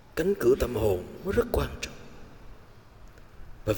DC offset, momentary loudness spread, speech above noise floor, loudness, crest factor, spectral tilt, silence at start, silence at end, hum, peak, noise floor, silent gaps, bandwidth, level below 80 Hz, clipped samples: 0.2%; 14 LU; 24 dB; -28 LUFS; 18 dB; -6 dB/octave; 0.15 s; 0 s; none; -12 dBFS; -50 dBFS; none; 18 kHz; -42 dBFS; under 0.1%